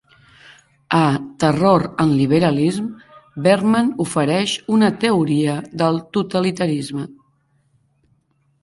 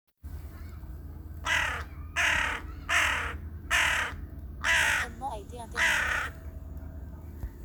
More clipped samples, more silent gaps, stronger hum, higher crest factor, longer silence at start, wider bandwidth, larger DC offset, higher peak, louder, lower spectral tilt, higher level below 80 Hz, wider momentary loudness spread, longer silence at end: neither; neither; neither; about the same, 16 dB vs 20 dB; first, 0.9 s vs 0.25 s; second, 11.5 kHz vs over 20 kHz; neither; first, -2 dBFS vs -10 dBFS; first, -18 LUFS vs -28 LUFS; first, -6 dB/octave vs -2 dB/octave; second, -54 dBFS vs -42 dBFS; second, 8 LU vs 19 LU; first, 1.5 s vs 0 s